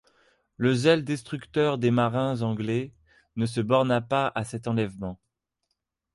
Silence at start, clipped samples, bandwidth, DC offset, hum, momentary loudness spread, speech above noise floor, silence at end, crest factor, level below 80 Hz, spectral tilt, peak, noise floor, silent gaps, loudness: 0.6 s; under 0.1%; 11.5 kHz; under 0.1%; none; 9 LU; 55 dB; 1 s; 18 dB; -58 dBFS; -6.5 dB/octave; -8 dBFS; -81 dBFS; none; -26 LUFS